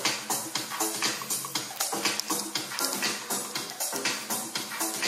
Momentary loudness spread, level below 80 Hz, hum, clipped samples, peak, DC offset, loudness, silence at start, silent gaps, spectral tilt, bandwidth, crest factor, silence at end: 4 LU; -82 dBFS; none; under 0.1%; -8 dBFS; under 0.1%; -29 LUFS; 0 s; none; -0.5 dB/octave; 16 kHz; 24 dB; 0 s